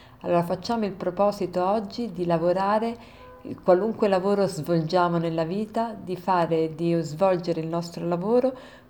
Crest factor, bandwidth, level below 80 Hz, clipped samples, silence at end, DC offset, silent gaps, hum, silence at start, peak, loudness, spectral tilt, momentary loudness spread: 18 dB; 19.5 kHz; -58 dBFS; under 0.1%; 0.15 s; under 0.1%; none; none; 0.1 s; -6 dBFS; -25 LUFS; -7 dB/octave; 7 LU